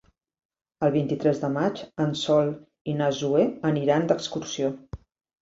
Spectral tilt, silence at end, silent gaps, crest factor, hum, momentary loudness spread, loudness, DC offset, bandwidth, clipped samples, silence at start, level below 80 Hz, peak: -6 dB/octave; 0.45 s; 2.81-2.85 s; 18 dB; none; 9 LU; -25 LUFS; under 0.1%; 7.8 kHz; under 0.1%; 0.8 s; -58 dBFS; -8 dBFS